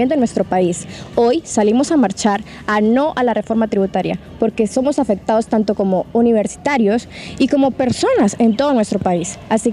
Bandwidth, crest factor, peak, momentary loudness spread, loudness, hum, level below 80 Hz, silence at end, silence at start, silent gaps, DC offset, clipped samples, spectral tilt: 11.5 kHz; 14 dB; -2 dBFS; 6 LU; -16 LUFS; none; -46 dBFS; 0 s; 0 s; none; under 0.1%; under 0.1%; -5.5 dB/octave